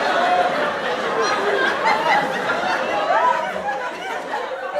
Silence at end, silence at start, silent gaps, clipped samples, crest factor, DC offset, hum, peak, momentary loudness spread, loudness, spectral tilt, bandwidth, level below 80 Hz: 0 s; 0 s; none; under 0.1%; 16 dB; under 0.1%; none; -6 dBFS; 8 LU; -20 LUFS; -3 dB/octave; 15 kHz; -62 dBFS